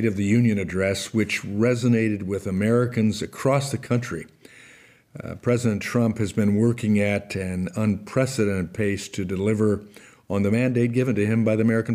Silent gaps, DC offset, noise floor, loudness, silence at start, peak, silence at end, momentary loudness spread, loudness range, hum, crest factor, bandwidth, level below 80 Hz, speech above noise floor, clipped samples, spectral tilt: none; under 0.1%; -52 dBFS; -23 LUFS; 0 s; -10 dBFS; 0 s; 7 LU; 3 LU; none; 14 dB; 15.5 kHz; -60 dBFS; 29 dB; under 0.1%; -6.5 dB/octave